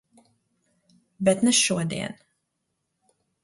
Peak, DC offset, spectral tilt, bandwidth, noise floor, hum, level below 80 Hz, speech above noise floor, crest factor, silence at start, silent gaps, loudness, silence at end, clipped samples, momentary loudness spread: -8 dBFS; under 0.1%; -3.5 dB/octave; 11.5 kHz; -78 dBFS; none; -64 dBFS; 56 dB; 20 dB; 1.2 s; none; -22 LUFS; 1.3 s; under 0.1%; 13 LU